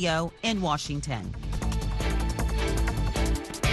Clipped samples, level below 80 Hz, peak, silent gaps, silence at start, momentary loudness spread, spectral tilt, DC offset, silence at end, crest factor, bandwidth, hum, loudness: under 0.1%; -30 dBFS; -12 dBFS; none; 0 s; 5 LU; -5 dB/octave; under 0.1%; 0 s; 14 dB; 12.5 kHz; none; -29 LUFS